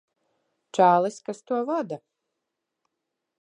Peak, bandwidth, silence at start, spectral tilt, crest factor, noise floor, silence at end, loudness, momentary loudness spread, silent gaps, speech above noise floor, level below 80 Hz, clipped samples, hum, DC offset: -6 dBFS; 10.5 kHz; 0.75 s; -6 dB/octave; 22 dB; -83 dBFS; 1.45 s; -24 LUFS; 17 LU; none; 59 dB; -86 dBFS; under 0.1%; none; under 0.1%